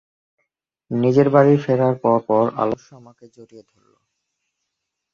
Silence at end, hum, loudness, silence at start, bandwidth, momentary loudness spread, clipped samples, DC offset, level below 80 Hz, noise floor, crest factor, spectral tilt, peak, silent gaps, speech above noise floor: 1.55 s; none; -17 LUFS; 0.9 s; 7 kHz; 10 LU; under 0.1%; under 0.1%; -62 dBFS; -79 dBFS; 18 dB; -9 dB/octave; -2 dBFS; none; 61 dB